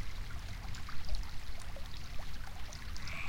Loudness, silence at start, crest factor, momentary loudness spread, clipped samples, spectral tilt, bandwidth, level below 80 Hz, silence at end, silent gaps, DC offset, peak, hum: -46 LUFS; 0 s; 14 dB; 4 LU; under 0.1%; -3.5 dB/octave; 16.5 kHz; -44 dBFS; 0 s; none; under 0.1%; -22 dBFS; none